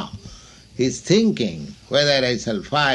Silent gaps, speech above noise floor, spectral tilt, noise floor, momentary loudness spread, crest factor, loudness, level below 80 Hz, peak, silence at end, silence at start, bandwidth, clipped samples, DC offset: none; 24 dB; -4.5 dB/octave; -44 dBFS; 17 LU; 18 dB; -20 LUFS; -50 dBFS; -4 dBFS; 0 s; 0 s; 11 kHz; under 0.1%; under 0.1%